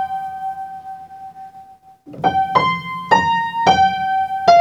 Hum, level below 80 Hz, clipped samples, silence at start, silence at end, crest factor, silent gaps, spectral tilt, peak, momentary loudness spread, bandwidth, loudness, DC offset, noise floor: none; -52 dBFS; under 0.1%; 0 s; 0 s; 18 dB; none; -4.5 dB/octave; 0 dBFS; 22 LU; 9 kHz; -17 LUFS; under 0.1%; -43 dBFS